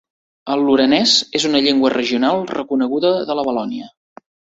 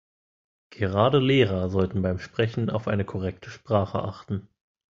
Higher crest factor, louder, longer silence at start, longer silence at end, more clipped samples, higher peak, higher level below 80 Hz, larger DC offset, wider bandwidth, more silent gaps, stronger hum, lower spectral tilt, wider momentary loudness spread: about the same, 16 dB vs 20 dB; first, -16 LUFS vs -25 LUFS; second, 0.45 s vs 0.8 s; about the same, 0.7 s vs 0.6 s; neither; first, -2 dBFS vs -6 dBFS; second, -60 dBFS vs -44 dBFS; neither; about the same, 8 kHz vs 7.4 kHz; neither; neither; second, -3.5 dB/octave vs -8 dB/octave; second, 10 LU vs 13 LU